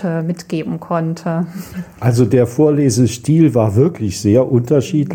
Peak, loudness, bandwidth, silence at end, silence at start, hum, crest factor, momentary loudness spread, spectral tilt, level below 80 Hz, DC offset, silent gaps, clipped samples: -2 dBFS; -15 LUFS; 17 kHz; 0 s; 0 s; none; 14 dB; 10 LU; -7 dB/octave; -48 dBFS; under 0.1%; none; under 0.1%